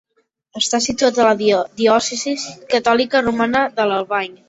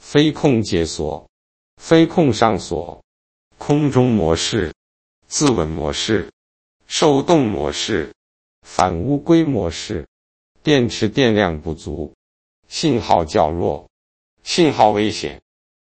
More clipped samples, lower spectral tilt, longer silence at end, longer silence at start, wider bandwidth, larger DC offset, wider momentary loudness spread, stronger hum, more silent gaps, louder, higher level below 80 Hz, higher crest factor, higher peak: neither; second, -2.5 dB/octave vs -5 dB/octave; second, 0.15 s vs 0.5 s; first, 0.55 s vs 0.05 s; about the same, 8.2 kHz vs 8.8 kHz; neither; second, 7 LU vs 14 LU; neither; second, none vs 1.29-1.77 s, 3.04-3.51 s, 4.76-5.22 s, 6.33-6.80 s, 8.16-8.62 s, 10.08-10.55 s, 12.14-12.63 s, 13.90-14.37 s; about the same, -17 LUFS vs -18 LUFS; second, -54 dBFS vs -40 dBFS; about the same, 16 dB vs 18 dB; about the same, -2 dBFS vs 0 dBFS